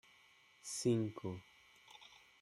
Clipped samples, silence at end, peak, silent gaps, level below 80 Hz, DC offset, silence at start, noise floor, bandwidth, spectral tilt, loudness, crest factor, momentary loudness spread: under 0.1%; 0.25 s; -24 dBFS; none; -80 dBFS; under 0.1%; 0.65 s; -68 dBFS; 14 kHz; -5.5 dB/octave; -40 LUFS; 20 dB; 23 LU